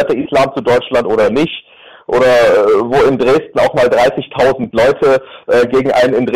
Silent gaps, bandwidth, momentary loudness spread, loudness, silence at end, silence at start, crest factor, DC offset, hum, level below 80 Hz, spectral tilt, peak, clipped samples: none; 14 kHz; 6 LU; -12 LUFS; 0 s; 0 s; 6 dB; 0.4%; none; -42 dBFS; -5.5 dB/octave; -4 dBFS; under 0.1%